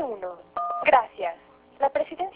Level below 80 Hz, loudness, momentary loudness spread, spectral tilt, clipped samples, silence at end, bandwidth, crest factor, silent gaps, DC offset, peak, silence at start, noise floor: -64 dBFS; -26 LUFS; 14 LU; -7 dB/octave; under 0.1%; 0.05 s; 4 kHz; 20 dB; none; under 0.1%; -6 dBFS; 0 s; -48 dBFS